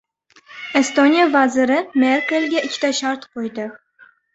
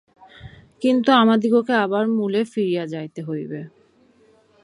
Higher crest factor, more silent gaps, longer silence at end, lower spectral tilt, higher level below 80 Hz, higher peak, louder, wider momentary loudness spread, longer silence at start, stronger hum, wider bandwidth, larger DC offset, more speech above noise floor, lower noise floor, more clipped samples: about the same, 16 dB vs 18 dB; neither; second, 0.6 s vs 0.95 s; second, -2.5 dB/octave vs -6.5 dB/octave; second, -66 dBFS vs -60 dBFS; about the same, -2 dBFS vs -2 dBFS; first, -17 LUFS vs -20 LUFS; about the same, 14 LU vs 15 LU; about the same, 0.5 s vs 0.45 s; neither; second, 8.2 kHz vs 11 kHz; neither; about the same, 34 dB vs 37 dB; second, -52 dBFS vs -56 dBFS; neither